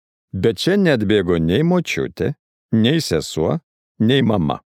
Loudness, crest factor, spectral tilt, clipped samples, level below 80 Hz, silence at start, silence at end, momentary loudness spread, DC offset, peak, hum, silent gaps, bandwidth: -18 LUFS; 16 dB; -6 dB/octave; under 0.1%; -44 dBFS; 0.35 s; 0.05 s; 9 LU; under 0.1%; -2 dBFS; none; 2.39-2.69 s, 3.63-3.95 s; 16 kHz